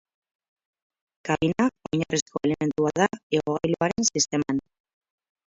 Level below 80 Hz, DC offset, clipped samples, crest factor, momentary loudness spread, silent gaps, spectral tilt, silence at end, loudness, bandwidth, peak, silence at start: -58 dBFS; under 0.1%; under 0.1%; 20 dB; 6 LU; 2.22-2.26 s, 3.23-3.30 s; -4 dB/octave; 0.9 s; -25 LUFS; 7.8 kHz; -8 dBFS; 1.25 s